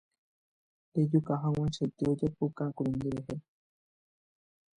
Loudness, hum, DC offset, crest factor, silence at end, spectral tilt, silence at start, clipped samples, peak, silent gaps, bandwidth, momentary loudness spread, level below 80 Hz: -32 LUFS; none; under 0.1%; 18 dB; 1.35 s; -8.5 dB/octave; 0.95 s; under 0.1%; -14 dBFS; none; 9.8 kHz; 9 LU; -60 dBFS